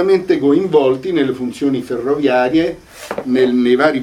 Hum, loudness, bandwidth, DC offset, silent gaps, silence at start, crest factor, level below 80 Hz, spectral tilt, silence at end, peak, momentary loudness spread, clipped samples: none; -15 LUFS; 13 kHz; under 0.1%; none; 0 s; 14 dB; -50 dBFS; -6.5 dB/octave; 0 s; 0 dBFS; 8 LU; under 0.1%